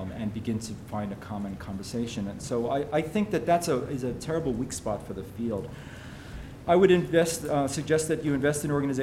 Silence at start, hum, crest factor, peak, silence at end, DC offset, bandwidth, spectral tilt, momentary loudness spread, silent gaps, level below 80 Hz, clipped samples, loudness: 0 s; none; 20 dB; -8 dBFS; 0 s; under 0.1%; 16 kHz; -5.5 dB/octave; 14 LU; none; -50 dBFS; under 0.1%; -28 LUFS